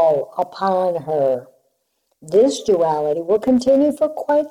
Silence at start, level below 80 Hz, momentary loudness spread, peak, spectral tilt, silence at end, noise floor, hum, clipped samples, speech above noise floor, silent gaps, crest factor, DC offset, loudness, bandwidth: 0 s; -58 dBFS; 6 LU; -6 dBFS; -6 dB/octave; 0 s; -69 dBFS; none; under 0.1%; 52 dB; none; 12 dB; under 0.1%; -18 LUFS; 14 kHz